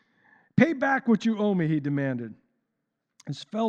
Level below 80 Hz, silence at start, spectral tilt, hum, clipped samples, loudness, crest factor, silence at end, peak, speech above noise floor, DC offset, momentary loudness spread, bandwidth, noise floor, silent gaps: -74 dBFS; 0.55 s; -7.5 dB/octave; none; under 0.1%; -25 LUFS; 22 dB; 0 s; -6 dBFS; 56 dB; under 0.1%; 16 LU; 8 kHz; -81 dBFS; none